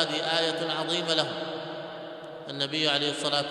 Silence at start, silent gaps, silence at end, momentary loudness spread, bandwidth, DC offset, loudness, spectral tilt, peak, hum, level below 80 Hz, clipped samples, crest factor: 0 s; none; 0 s; 14 LU; 12.5 kHz; under 0.1%; -27 LUFS; -3 dB/octave; -8 dBFS; none; -74 dBFS; under 0.1%; 22 dB